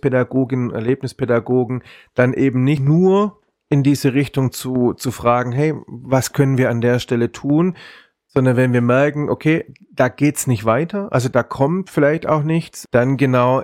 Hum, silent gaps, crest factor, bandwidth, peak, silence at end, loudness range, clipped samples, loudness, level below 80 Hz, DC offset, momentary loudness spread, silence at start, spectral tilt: none; none; 16 dB; 16.5 kHz; -2 dBFS; 0 s; 1 LU; under 0.1%; -17 LUFS; -52 dBFS; under 0.1%; 6 LU; 0.05 s; -7 dB/octave